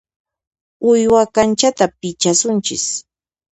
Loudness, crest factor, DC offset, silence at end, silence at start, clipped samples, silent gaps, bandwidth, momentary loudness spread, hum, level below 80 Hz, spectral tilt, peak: -15 LUFS; 16 dB; under 0.1%; 0.5 s; 0.8 s; under 0.1%; none; 9 kHz; 8 LU; none; -52 dBFS; -3.5 dB/octave; 0 dBFS